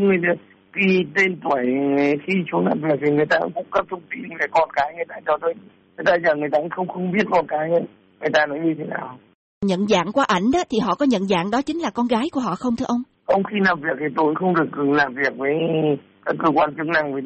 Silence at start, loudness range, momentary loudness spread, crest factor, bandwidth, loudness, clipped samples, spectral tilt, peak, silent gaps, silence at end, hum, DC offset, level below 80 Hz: 0 s; 2 LU; 8 LU; 14 dB; 8.4 kHz; -21 LUFS; under 0.1%; -6 dB/octave; -6 dBFS; 9.34-9.61 s; 0 s; none; under 0.1%; -58 dBFS